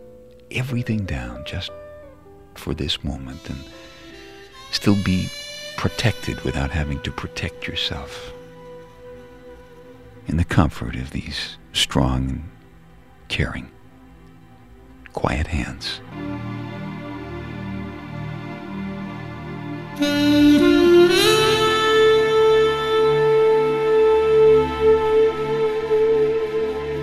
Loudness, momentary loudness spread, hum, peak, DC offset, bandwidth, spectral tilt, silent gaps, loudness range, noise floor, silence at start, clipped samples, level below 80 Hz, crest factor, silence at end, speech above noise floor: -20 LUFS; 20 LU; none; -2 dBFS; 0.2%; 14.5 kHz; -5.5 dB/octave; none; 15 LU; -48 dBFS; 0 s; under 0.1%; -38 dBFS; 18 dB; 0 s; 24 dB